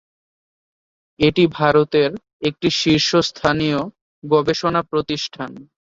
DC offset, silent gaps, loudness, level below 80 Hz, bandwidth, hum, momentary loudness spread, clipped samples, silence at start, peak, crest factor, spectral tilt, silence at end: under 0.1%; 2.33-2.40 s, 4.01-4.22 s; -18 LUFS; -50 dBFS; 7.8 kHz; none; 11 LU; under 0.1%; 1.2 s; -2 dBFS; 18 dB; -5 dB/octave; 0.3 s